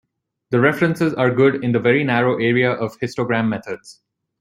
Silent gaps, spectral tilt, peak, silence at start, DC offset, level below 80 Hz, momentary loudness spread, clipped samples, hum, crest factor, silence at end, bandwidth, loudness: none; -7 dB/octave; -2 dBFS; 0.5 s; under 0.1%; -58 dBFS; 9 LU; under 0.1%; none; 18 dB; 0.5 s; 14.5 kHz; -18 LUFS